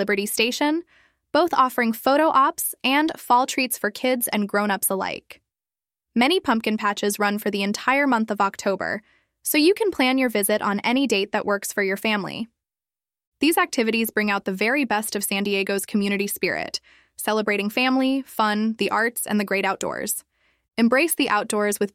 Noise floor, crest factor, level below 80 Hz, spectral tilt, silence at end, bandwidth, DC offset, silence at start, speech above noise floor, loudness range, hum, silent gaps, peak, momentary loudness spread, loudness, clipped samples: under -90 dBFS; 18 dB; -66 dBFS; -3.5 dB/octave; 0.05 s; 16.5 kHz; under 0.1%; 0 s; over 68 dB; 3 LU; none; 13.27-13.32 s; -4 dBFS; 8 LU; -22 LUFS; under 0.1%